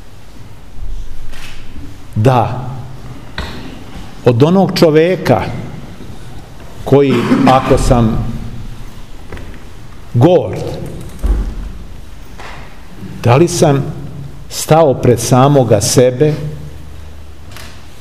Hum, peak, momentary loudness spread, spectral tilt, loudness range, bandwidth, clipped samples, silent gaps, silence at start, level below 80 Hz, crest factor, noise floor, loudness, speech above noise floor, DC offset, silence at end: none; 0 dBFS; 24 LU; -6 dB/octave; 7 LU; 15.5 kHz; 0.2%; none; 0 s; -26 dBFS; 14 dB; -34 dBFS; -12 LUFS; 24 dB; 4%; 0.1 s